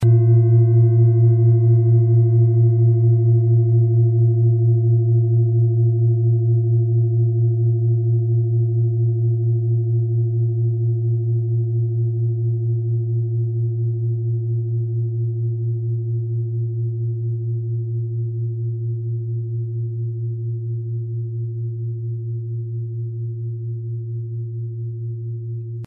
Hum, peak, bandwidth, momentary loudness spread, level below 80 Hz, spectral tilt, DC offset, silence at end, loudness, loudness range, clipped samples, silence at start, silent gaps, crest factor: none; -6 dBFS; 1.1 kHz; 12 LU; -60 dBFS; -15.5 dB/octave; under 0.1%; 0 s; -19 LUFS; 11 LU; under 0.1%; 0 s; none; 12 dB